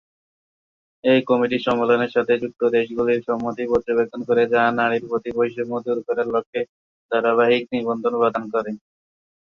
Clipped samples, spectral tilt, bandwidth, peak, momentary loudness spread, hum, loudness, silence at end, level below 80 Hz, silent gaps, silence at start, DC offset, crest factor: under 0.1%; -7 dB/octave; 6.6 kHz; -4 dBFS; 8 LU; none; -21 LUFS; 0.7 s; -60 dBFS; 6.46-6.53 s, 6.69-7.09 s; 1.05 s; under 0.1%; 16 dB